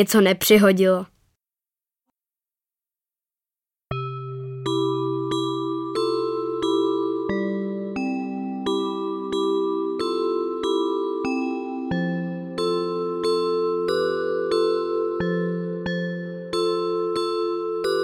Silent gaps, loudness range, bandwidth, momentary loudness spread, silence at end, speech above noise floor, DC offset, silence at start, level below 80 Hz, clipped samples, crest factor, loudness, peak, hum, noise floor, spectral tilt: none; 6 LU; 16.5 kHz; 8 LU; 0 s; over 73 dB; under 0.1%; 0 s; -60 dBFS; under 0.1%; 18 dB; -24 LUFS; -4 dBFS; none; under -90 dBFS; -5.5 dB/octave